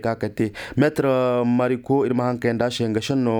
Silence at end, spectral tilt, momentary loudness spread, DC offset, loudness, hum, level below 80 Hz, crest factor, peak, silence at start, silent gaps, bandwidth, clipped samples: 0 s; -6.5 dB/octave; 5 LU; under 0.1%; -21 LUFS; none; -54 dBFS; 16 dB; -6 dBFS; 0 s; none; 19 kHz; under 0.1%